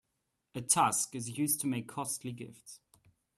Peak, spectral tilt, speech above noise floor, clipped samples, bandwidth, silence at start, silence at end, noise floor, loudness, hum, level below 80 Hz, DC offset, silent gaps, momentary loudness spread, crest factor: -12 dBFS; -3 dB/octave; 49 dB; under 0.1%; 15.5 kHz; 0.55 s; 0.6 s; -83 dBFS; -32 LUFS; none; -74 dBFS; under 0.1%; none; 20 LU; 24 dB